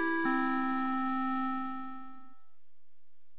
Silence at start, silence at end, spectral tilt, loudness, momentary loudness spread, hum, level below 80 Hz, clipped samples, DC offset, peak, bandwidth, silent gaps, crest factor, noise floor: 0 s; 1.15 s; -2.5 dB/octave; -32 LUFS; 16 LU; none; -76 dBFS; under 0.1%; 1%; -18 dBFS; 4 kHz; none; 16 dB; -85 dBFS